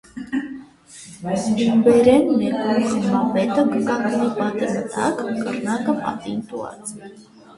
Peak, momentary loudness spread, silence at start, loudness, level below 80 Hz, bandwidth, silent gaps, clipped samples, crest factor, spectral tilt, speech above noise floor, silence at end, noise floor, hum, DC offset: -2 dBFS; 18 LU; 0.15 s; -20 LUFS; -56 dBFS; 11.5 kHz; none; under 0.1%; 18 dB; -6 dB/octave; 24 dB; 0.35 s; -43 dBFS; none; under 0.1%